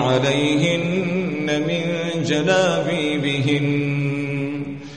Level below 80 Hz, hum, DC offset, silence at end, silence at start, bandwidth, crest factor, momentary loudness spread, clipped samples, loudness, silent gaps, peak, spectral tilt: -56 dBFS; none; 0.3%; 0 s; 0 s; 9.6 kHz; 16 dB; 6 LU; under 0.1%; -20 LUFS; none; -4 dBFS; -5.5 dB/octave